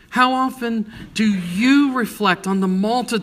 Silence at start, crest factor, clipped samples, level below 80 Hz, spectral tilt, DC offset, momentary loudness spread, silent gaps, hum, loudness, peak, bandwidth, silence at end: 0.1 s; 16 dB; under 0.1%; -54 dBFS; -5.5 dB/octave; under 0.1%; 9 LU; none; none; -19 LUFS; -2 dBFS; 15.5 kHz; 0 s